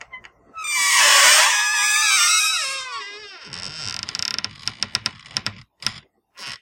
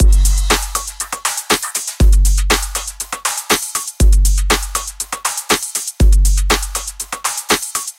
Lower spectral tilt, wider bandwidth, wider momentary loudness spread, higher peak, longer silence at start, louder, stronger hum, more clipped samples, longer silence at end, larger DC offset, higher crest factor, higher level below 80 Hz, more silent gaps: second, 2 dB/octave vs -3 dB/octave; about the same, 16.5 kHz vs 16.5 kHz; first, 21 LU vs 8 LU; about the same, 0 dBFS vs 0 dBFS; first, 0.15 s vs 0 s; about the same, -17 LUFS vs -16 LUFS; neither; neither; about the same, 0.05 s vs 0.05 s; neither; first, 22 dB vs 14 dB; second, -62 dBFS vs -16 dBFS; neither